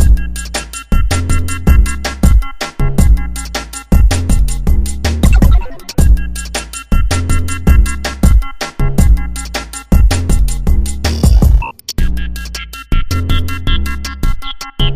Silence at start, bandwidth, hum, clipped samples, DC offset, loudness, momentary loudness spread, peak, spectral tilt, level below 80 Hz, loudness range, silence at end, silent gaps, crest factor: 0 s; 15.5 kHz; none; 0.6%; under 0.1%; -15 LUFS; 9 LU; 0 dBFS; -5 dB/octave; -12 dBFS; 2 LU; 0 s; none; 10 dB